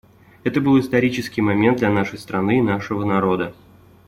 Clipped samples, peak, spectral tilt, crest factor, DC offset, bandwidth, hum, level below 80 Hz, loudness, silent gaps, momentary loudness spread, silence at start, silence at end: under 0.1%; -4 dBFS; -7 dB/octave; 16 dB; under 0.1%; 15 kHz; none; -52 dBFS; -19 LUFS; none; 7 LU; 0.45 s; 0.55 s